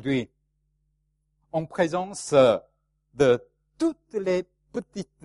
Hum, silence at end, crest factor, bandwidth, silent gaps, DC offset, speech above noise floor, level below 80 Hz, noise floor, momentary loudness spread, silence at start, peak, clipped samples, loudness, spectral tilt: none; 0.2 s; 20 dB; 11.5 kHz; none; under 0.1%; 49 dB; -60 dBFS; -73 dBFS; 16 LU; 0.05 s; -6 dBFS; under 0.1%; -25 LUFS; -5.5 dB/octave